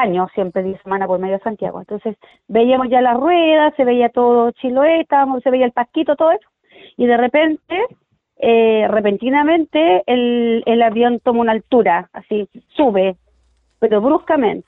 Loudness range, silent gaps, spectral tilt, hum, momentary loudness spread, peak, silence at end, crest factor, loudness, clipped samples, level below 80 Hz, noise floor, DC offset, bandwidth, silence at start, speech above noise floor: 3 LU; none; -8.5 dB/octave; none; 9 LU; -2 dBFS; 0.05 s; 14 dB; -15 LUFS; under 0.1%; -56 dBFS; -59 dBFS; under 0.1%; 4 kHz; 0 s; 44 dB